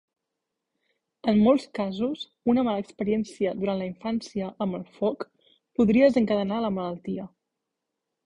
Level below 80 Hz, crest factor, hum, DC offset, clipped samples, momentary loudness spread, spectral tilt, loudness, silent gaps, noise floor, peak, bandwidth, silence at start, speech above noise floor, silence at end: -60 dBFS; 18 dB; none; under 0.1%; under 0.1%; 13 LU; -7.5 dB/octave; -26 LUFS; none; -84 dBFS; -8 dBFS; 10.5 kHz; 1.25 s; 59 dB; 1 s